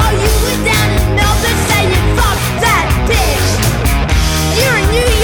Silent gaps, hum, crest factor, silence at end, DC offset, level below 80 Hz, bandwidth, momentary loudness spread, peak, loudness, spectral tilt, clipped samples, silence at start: none; none; 10 dB; 0 s; under 0.1%; -16 dBFS; over 20 kHz; 2 LU; -2 dBFS; -12 LUFS; -4 dB/octave; under 0.1%; 0 s